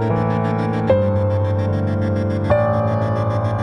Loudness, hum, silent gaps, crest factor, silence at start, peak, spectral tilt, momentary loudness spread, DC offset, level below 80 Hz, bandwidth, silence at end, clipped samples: -19 LUFS; none; none; 16 dB; 0 s; -2 dBFS; -9.5 dB/octave; 3 LU; under 0.1%; -42 dBFS; 6 kHz; 0 s; under 0.1%